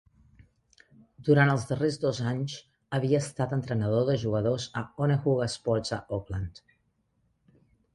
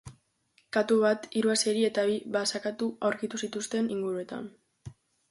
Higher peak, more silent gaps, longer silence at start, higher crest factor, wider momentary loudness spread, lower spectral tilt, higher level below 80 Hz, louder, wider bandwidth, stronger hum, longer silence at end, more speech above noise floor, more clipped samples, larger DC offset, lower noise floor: about the same, -10 dBFS vs -12 dBFS; neither; first, 1.2 s vs 0.05 s; about the same, 18 dB vs 18 dB; about the same, 11 LU vs 9 LU; first, -6.5 dB/octave vs -3.5 dB/octave; first, -54 dBFS vs -68 dBFS; about the same, -28 LUFS vs -29 LUFS; about the same, 11.5 kHz vs 11.5 kHz; neither; first, 1.45 s vs 0.4 s; first, 45 dB vs 41 dB; neither; neither; first, -73 dBFS vs -69 dBFS